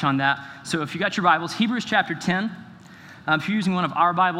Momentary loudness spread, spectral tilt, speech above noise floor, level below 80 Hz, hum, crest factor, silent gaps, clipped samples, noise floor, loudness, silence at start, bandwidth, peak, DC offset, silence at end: 9 LU; -5 dB/octave; 22 dB; -68 dBFS; none; 18 dB; none; under 0.1%; -45 dBFS; -23 LUFS; 0 s; 14.5 kHz; -4 dBFS; under 0.1%; 0 s